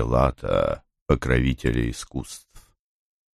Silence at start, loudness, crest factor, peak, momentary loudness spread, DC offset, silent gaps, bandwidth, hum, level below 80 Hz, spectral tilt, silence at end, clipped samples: 0 s; -24 LUFS; 20 dB; -4 dBFS; 12 LU; under 0.1%; 1.01-1.06 s; 13 kHz; none; -32 dBFS; -6.5 dB/octave; 0.75 s; under 0.1%